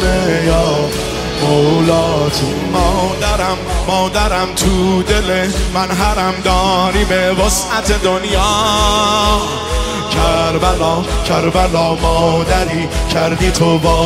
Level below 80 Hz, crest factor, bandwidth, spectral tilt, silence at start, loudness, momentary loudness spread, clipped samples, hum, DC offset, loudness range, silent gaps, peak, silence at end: -22 dBFS; 12 dB; 16 kHz; -4.5 dB/octave; 0 s; -14 LUFS; 5 LU; under 0.1%; none; under 0.1%; 1 LU; none; 0 dBFS; 0 s